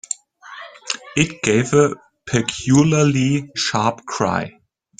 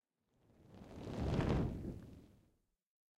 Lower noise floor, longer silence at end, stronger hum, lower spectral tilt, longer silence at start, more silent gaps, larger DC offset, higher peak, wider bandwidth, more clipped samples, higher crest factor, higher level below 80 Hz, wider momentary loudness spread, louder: second, -40 dBFS vs -78 dBFS; second, 0.5 s vs 0.95 s; neither; second, -5 dB/octave vs -8 dB/octave; second, 0.1 s vs 0.6 s; neither; neither; first, 0 dBFS vs -26 dBFS; second, 9.6 kHz vs 13 kHz; neither; about the same, 18 dB vs 18 dB; about the same, -50 dBFS vs -52 dBFS; second, 19 LU vs 22 LU; first, -19 LUFS vs -41 LUFS